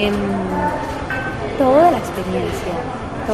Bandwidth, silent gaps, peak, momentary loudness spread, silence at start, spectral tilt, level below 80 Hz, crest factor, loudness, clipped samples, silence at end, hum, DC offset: 14 kHz; none; -2 dBFS; 11 LU; 0 s; -6 dB/octave; -36 dBFS; 16 dB; -19 LUFS; under 0.1%; 0 s; none; under 0.1%